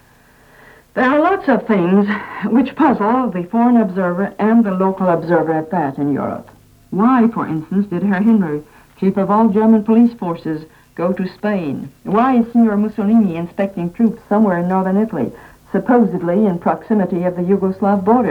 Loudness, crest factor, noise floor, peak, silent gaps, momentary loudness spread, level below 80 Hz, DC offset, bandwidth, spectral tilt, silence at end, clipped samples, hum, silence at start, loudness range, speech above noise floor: -16 LUFS; 14 dB; -49 dBFS; -2 dBFS; none; 9 LU; -52 dBFS; under 0.1%; 4.8 kHz; -9.5 dB/octave; 0 s; under 0.1%; none; 0.95 s; 2 LU; 34 dB